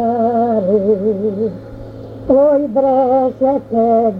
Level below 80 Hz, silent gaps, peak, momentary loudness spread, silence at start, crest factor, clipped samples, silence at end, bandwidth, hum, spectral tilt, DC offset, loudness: -44 dBFS; none; -2 dBFS; 17 LU; 0 s; 12 dB; under 0.1%; 0 s; 4.9 kHz; none; -10.5 dB/octave; under 0.1%; -14 LUFS